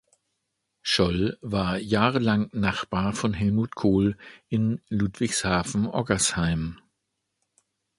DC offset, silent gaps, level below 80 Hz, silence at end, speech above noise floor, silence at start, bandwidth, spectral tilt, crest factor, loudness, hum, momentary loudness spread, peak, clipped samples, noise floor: under 0.1%; none; -46 dBFS; 1.25 s; 55 dB; 0.85 s; 11.5 kHz; -5 dB/octave; 22 dB; -25 LUFS; none; 5 LU; -4 dBFS; under 0.1%; -80 dBFS